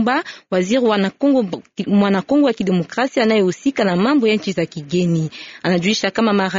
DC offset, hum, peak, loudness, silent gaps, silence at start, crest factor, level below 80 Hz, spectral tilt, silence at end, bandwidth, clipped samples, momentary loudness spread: under 0.1%; none; -4 dBFS; -18 LUFS; none; 0 s; 12 dB; -56 dBFS; -5 dB/octave; 0 s; 7.8 kHz; under 0.1%; 7 LU